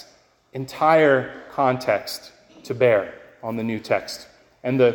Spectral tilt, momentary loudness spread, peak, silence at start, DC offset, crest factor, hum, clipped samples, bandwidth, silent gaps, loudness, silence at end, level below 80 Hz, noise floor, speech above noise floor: -6 dB/octave; 18 LU; -4 dBFS; 0.55 s; under 0.1%; 18 dB; none; under 0.1%; 17 kHz; none; -21 LUFS; 0 s; -62 dBFS; -56 dBFS; 35 dB